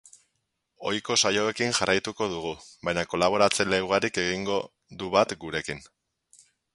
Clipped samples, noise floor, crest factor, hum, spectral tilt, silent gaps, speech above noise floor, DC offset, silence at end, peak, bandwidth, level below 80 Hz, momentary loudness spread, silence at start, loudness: under 0.1%; -78 dBFS; 24 dB; none; -3 dB/octave; none; 52 dB; under 0.1%; 0.9 s; -4 dBFS; 11.5 kHz; -58 dBFS; 13 LU; 0.8 s; -26 LUFS